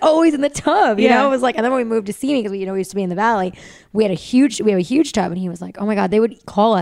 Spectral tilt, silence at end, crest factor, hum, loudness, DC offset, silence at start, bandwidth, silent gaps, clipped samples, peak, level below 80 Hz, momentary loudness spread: -5.5 dB/octave; 0 s; 16 dB; none; -17 LUFS; under 0.1%; 0 s; 14 kHz; none; under 0.1%; 0 dBFS; -50 dBFS; 9 LU